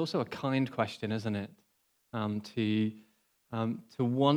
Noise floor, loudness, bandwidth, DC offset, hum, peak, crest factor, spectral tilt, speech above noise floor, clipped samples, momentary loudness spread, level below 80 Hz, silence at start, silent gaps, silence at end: -63 dBFS; -34 LUFS; 14.5 kHz; under 0.1%; none; -12 dBFS; 20 dB; -7 dB/octave; 31 dB; under 0.1%; 7 LU; -76 dBFS; 0 s; none; 0 s